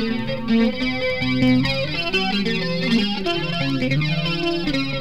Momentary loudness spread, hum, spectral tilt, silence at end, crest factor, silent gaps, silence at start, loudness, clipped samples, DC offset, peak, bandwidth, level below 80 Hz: 4 LU; none; -6 dB/octave; 0 s; 16 dB; none; 0 s; -21 LUFS; under 0.1%; 2%; -4 dBFS; 12 kHz; -42 dBFS